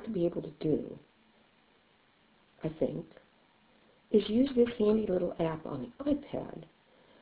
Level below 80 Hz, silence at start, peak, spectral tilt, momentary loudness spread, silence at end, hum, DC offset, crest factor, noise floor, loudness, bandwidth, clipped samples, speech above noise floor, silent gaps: -60 dBFS; 0 s; -14 dBFS; -7 dB/octave; 17 LU; 0.6 s; none; under 0.1%; 20 dB; -67 dBFS; -32 LUFS; 4 kHz; under 0.1%; 35 dB; none